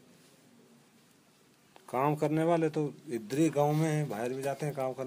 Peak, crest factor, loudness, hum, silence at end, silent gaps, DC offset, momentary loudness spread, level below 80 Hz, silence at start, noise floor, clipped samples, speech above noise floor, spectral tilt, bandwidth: -14 dBFS; 18 dB; -31 LUFS; none; 0 s; none; under 0.1%; 8 LU; -78 dBFS; 1.9 s; -64 dBFS; under 0.1%; 33 dB; -7 dB/octave; 15.5 kHz